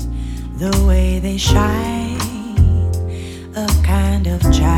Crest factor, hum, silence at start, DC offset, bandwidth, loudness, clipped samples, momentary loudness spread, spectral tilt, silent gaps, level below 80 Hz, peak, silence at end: 14 dB; none; 0 s; under 0.1%; 16.5 kHz; -17 LUFS; under 0.1%; 11 LU; -6 dB/octave; none; -18 dBFS; 0 dBFS; 0 s